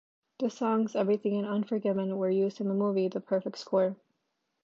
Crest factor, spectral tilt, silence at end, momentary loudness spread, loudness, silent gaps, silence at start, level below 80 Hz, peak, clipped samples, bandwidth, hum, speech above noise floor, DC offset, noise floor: 16 dB; -7.5 dB/octave; 0.7 s; 4 LU; -30 LUFS; none; 0.4 s; -84 dBFS; -14 dBFS; under 0.1%; 7.2 kHz; none; 51 dB; under 0.1%; -80 dBFS